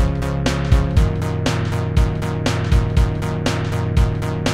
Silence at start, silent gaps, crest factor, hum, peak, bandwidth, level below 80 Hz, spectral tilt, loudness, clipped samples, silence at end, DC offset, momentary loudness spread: 0 s; none; 16 dB; none; -2 dBFS; 14.5 kHz; -22 dBFS; -6.5 dB/octave; -19 LUFS; under 0.1%; 0 s; 1%; 4 LU